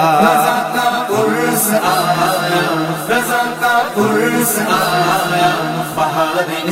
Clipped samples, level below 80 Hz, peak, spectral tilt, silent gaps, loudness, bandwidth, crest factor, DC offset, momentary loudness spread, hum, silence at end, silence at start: under 0.1%; -56 dBFS; 0 dBFS; -3.5 dB/octave; none; -14 LUFS; 16.5 kHz; 14 dB; under 0.1%; 4 LU; none; 0 s; 0 s